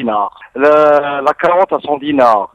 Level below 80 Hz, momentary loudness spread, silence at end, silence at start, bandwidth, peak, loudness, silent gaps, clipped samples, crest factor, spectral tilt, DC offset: -54 dBFS; 8 LU; 0.1 s; 0 s; 8 kHz; 0 dBFS; -12 LUFS; none; under 0.1%; 12 dB; -6 dB/octave; under 0.1%